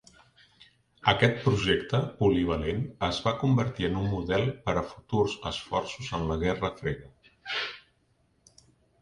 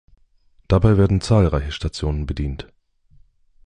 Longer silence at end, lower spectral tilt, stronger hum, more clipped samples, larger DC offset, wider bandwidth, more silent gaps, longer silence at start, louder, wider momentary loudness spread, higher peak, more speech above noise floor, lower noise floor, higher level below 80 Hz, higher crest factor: first, 1.25 s vs 1.05 s; second, -6 dB/octave vs -7.5 dB/octave; neither; neither; neither; about the same, 10.5 kHz vs 10 kHz; neither; first, 1.05 s vs 0.7 s; second, -28 LUFS vs -20 LUFS; about the same, 10 LU vs 11 LU; second, -6 dBFS vs -2 dBFS; about the same, 41 dB vs 38 dB; first, -69 dBFS vs -56 dBFS; second, -46 dBFS vs -30 dBFS; first, 24 dB vs 18 dB